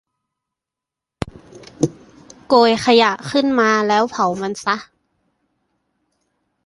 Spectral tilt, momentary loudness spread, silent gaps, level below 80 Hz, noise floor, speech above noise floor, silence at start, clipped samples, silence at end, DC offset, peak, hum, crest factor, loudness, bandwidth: -4.5 dB/octave; 16 LU; none; -52 dBFS; -86 dBFS; 70 dB; 1.25 s; under 0.1%; 1.8 s; under 0.1%; -2 dBFS; none; 18 dB; -17 LUFS; 11.5 kHz